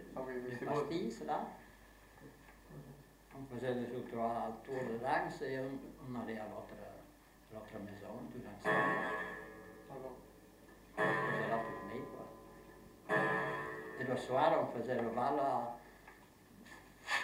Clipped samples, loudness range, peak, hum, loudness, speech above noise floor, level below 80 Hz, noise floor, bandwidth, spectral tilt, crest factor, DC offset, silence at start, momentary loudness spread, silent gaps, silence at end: under 0.1%; 7 LU; -18 dBFS; none; -39 LUFS; 23 dB; -68 dBFS; -62 dBFS; 16 kHz; -5.5 dB/octave; 24 dB; under 0.1%; 0 s; 23 LU; none; 0 s